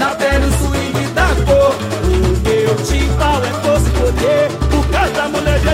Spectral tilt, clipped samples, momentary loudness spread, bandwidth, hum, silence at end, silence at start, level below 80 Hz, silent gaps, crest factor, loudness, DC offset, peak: -5.5 dB/octave; under 0.1%; 4 LU; 16 kHz; none; 0 s; 0 s; -18 dBFS; none; 10 dB; -14 LUFS; under 0.1%; -2 dBFS